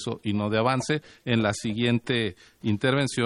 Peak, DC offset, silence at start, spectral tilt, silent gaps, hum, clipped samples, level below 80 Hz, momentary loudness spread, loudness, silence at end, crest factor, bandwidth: -8 dBFS; under 0.1%; 0 s; -5.5 dB/octave; none; none; under 0.1%; -58 dBFS; 6 LU; -26 LUFS; 0 s; 18 dB; 12 kHz